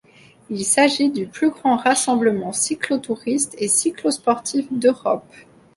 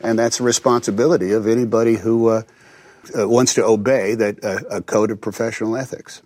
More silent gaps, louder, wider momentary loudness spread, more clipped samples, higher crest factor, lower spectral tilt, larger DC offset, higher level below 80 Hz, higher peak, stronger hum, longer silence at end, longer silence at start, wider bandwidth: neither; about the same, -19 LUFS vs -18 LUFS; about the same, 7 LU vs 8 LU; neither; about the same, 18 dB vs 16 dB; second, -3 dB/octave vs -4.5 dB/octave; neither; about the same, -64 dBFS vs -60 dBFS; about the same, -2 dBFS vs -2 dBFS; neither; first, 0.35 s vs 0.1 s; first, 0.5 s vs 0.05 s; second, 11.5 kHz vs 15.5 kHz